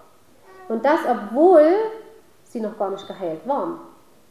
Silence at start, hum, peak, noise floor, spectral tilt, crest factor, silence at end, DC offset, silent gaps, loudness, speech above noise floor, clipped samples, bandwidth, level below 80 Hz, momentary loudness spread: 0.6 s; none; -2 dBFS; -52 dBFS; -6.5 dB/octave; 18 dB; 0.45 s; 0.2%; none; -20 LUFS; 33 dB; under 0.1%; 13.5 kHz; -70 dBFS; 17 LU